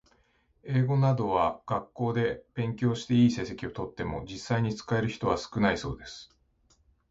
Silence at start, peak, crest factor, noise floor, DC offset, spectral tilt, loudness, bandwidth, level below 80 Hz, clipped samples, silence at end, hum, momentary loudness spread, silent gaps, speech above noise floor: 0.65 s; -10 dBFS; 20 dB; -68 dBFS; under 0.1%; -7 dB/octave; -29 LUFS; 7.8 kHz; -52 dBFS; under 0.1%; 0.85 s; none; 12 LU; none; 40 dB